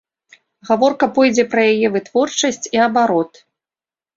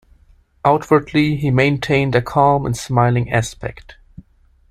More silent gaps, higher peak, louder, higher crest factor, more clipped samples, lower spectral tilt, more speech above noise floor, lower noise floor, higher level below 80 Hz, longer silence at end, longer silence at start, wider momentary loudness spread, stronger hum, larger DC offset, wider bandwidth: neither; about the same, -2 dBFS vs 0 dBFS; about the same, -16 LUFS vs -17 LUFS; about the same, 16 dB vs 16 dB; neither; second, -3.5 dB/octave vs -6.5 dB/octave; first, over 75 dB vs 36 dB; first, under -90 dBFS vs -52 dBFS; second, -62 dBFS vs -42 dBFS; about the same, 0.9 s vs 0.8 s; about the same, 0.65 s vs 0.65 s; about the same, 5 LU vs 5 LU; neither; neither; second, 7.8 kHz vs 14 kHz